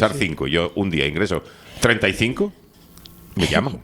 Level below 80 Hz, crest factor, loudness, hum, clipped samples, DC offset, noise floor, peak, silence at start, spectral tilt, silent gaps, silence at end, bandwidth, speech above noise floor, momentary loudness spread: -42 dBFS; 22 dB; -21 LUFS; none; under 0.1%; under 0.1%; -46 dBFS; 0 dBFS; 0 s; -5 dB/octave; none; 0 s; over 20 kHz; 25 dB; 9 LU